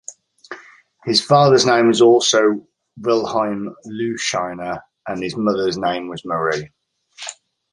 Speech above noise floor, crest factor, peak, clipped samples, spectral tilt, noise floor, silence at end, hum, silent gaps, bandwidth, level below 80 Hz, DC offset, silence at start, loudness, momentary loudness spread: 29 dB; 18 dB; -2 dBFS; under 0.1%; -4 dB/octave; -46 dBFS; 0.4 s; none; none; 11.5 kHz; -58 dBFS; under 0.1%; 0.1 s; -17 LUFS; 20 LU